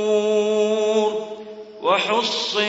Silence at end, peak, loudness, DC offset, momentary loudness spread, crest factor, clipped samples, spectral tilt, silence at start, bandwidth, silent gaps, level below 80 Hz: 0 s; -6 dBFS; -20 LUFS; under 0.1%; 14 LU; 14 dB; under 0.1%; -3 dB/octave; 0 s; 8 kHz; none; -70 dBFS